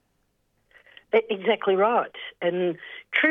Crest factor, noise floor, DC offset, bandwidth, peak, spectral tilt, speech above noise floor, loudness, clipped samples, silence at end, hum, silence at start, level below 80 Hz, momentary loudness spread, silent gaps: 20 dB; -71 dBFS; under 0.1%; 4.1 kHz; -6 dBFS; -7 dB/octave; 47 dB; -24 LUFS; under 0.1%; 0 s; none; 1.15 s; -76 dBFS; 8 LU; none